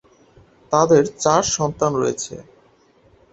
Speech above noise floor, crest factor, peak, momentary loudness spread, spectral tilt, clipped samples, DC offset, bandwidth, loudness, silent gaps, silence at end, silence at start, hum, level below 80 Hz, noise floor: 37 dB; 20 dB; -2 dBFS; 14 LU; -4.5 dB/octave; under 0.1%; under 0.1%; 8.2 kHz; -18 LUFS; none; 0.9 s; 0.7 s; none; -52 dBFS; -55 dBFS